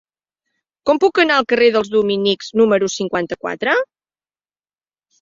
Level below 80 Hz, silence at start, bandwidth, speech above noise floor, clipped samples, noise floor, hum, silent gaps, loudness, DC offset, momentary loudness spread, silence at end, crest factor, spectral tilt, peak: -60 dBFS; 0.85 s; 7.6 kHz; over 74 dB; under 0.1%; under -90 dBFS; none; none; -16 LUFS; under 0.1%; 8 LU; 1.35 s; 18 dB; -4 dB/octave; 0 dBFS